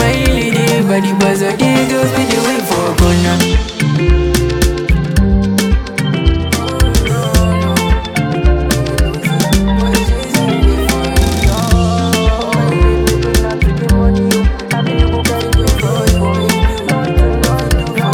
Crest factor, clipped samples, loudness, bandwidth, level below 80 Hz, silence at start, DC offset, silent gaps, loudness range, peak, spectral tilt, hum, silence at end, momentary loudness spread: 12 dB; under 0.1%; -13 LUFS; 17.5 kHz; -16 dBFS; 0 s; under 0.1%; none; 1 LU; 0 dBFS; -5.5 dB/octave; none; 0 s; 3 LU